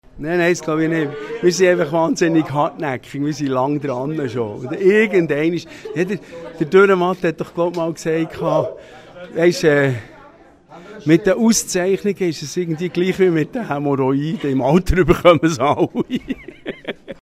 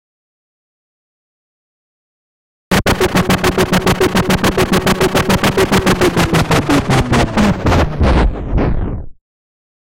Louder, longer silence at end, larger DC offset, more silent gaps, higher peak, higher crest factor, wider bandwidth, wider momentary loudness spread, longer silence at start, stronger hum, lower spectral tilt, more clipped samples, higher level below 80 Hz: second, -18 LUFS vs -13 LUFS; second, 0.1 s vs 0.7 s; second, under 0.1% vs 2%; neither; about the same, 0 dBFS vs -2 dBFS; first, 18 dB vs 12 dB; second, 15 kHz vs 17 kHz; first, 13 LU vs 5 LU; second, 0.15 s vs 2.7 s; neither; about the same, -5.5 dB/octave vs -5 dB/octave; neither; second, -38 dBFS vs -24 dBFS